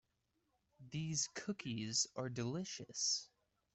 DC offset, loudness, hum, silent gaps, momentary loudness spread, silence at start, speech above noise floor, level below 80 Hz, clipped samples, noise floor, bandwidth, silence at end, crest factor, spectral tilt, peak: under 0.1%; -40 LUFS; none; none; 8 LU; 0.8 s; 42 dB; -76 dBFS; under 0.1%; -84 dBFS; 8.2 kHz; 0.5 s; 20 dB; -3 dB/octave; -24 dBFS